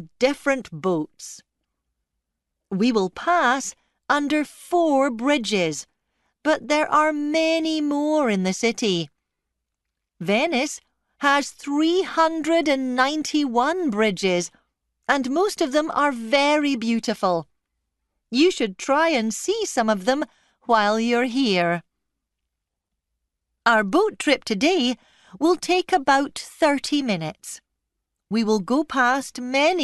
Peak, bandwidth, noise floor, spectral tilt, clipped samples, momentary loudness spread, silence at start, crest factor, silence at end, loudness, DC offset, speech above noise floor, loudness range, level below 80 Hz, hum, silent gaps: -4 dBFS; 12 kHz; -82 dBFS; -4 dB/octave; under 0.1%; 8 LU; 0 s; 18 dB; 0 s; -22 LUFS; under 0.1%; 61 dB; 3 LU; -62 dBFS; none; none